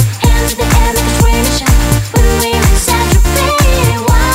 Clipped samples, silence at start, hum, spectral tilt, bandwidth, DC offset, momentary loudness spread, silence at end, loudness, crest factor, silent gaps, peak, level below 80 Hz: under 0.1%; 0 s; none; -4.5 dB/octave; 16.5 kHz; under 0.1%; 1 LU; 0 s; -11 LUFS; 10 dB; none; 0 dBFS; -12 dBFS